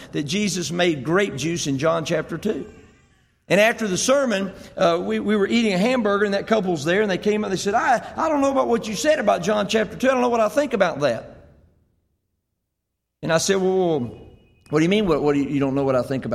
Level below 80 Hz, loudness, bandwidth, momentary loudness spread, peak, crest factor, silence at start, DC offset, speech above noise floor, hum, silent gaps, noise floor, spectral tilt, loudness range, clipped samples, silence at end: -52 dBFS; -21 LUFS; 15.5 kHz; 6 LU; -4 dBFS; 16 dB; 0 s; under 0.1%; 59 dB; none; none; -79 dBFS; -4.5 dB/octave; 5 LU; under 0.1%; 0 s